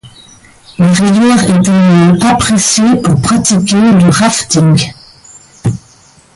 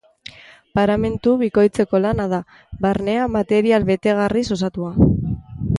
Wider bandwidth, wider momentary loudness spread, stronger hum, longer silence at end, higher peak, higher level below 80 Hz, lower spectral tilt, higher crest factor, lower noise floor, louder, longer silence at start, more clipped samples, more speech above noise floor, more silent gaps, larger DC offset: about the same, 11.5 kHz vs 11.5 kHz; about the same, 11 LU vs 10 LU; neither; first, 0.55 s vs 0 s; about the same, 0 dBFS vs -2 dBFS; about the same, -38 dBFS vs -36 dBFS; second, -5 dB/octave vs -7.5 dB/octave; second, 10 dB vs 18 dB; about the same, -42 dBFS vs -42 dBFS; first, -8 LUFS vs -19 LUFS; second, 0.05 s vs 0.75 s; neither; first, 35 dB vs 24 dB; neither; neither